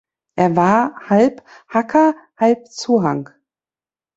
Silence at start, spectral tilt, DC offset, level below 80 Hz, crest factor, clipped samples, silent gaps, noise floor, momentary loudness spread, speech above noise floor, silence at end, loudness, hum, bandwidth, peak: 0.35 s; -6.5 dB/octave; under 0.1%; -60 dBFS; 16 dB; under 0.1%; none; under -90 dBFS; 8 LU; over 74 dB; 0.95 s; -17 LUFS; none; 8 kHz; -2 dBFS